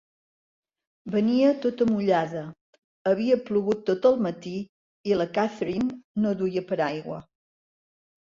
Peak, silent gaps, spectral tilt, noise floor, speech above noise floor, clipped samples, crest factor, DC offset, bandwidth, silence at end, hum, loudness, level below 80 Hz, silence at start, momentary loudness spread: -8 dBFS; 2.61-3.05 s, 4.69-5.04 s, 6.04-6.15 s; -7.5 dB/octave; under -90 dBFS; over 66 dB; under 0.1%; 18 dB; under 0.1%; 7.4 kHz; 1.05 s; none; -25 LUFS; -64 dBFS; 1.05 s; 14 LU